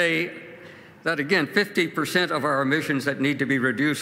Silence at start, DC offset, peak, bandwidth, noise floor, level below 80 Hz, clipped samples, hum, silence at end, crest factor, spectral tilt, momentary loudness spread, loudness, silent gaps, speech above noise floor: 0 s; under 0.1%; -6 dBFS; 16 kHz; -45 dBFS; -72 dBFS; under 0.1%; none; 0 s; 18 dB; -5 dB/octave; 9 LU; -23 LUFS; none; 22 dB